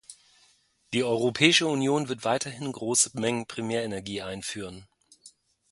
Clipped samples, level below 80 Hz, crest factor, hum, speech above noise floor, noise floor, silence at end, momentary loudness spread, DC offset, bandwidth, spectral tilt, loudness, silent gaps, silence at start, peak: under 0.1%; -64 dBFS; 26 dB; none; 37 dB; -64 dBFS; 0.45 s; 14 LU; under 0.1%; 11.5 kHz; -3 dB/octave; -26 LUFS; none; 0.1 s; -4 dBFS